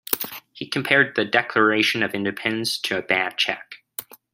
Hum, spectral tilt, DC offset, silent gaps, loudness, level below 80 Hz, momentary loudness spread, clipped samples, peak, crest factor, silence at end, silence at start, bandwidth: none; -3.5 dB/octave; under 0.1%; none; -21 LUFS; -66 dBFS; 17 LU; under 0.1%; -2 dBFS; 22 dB; 0.3 s; 0.1 s; 16 kHz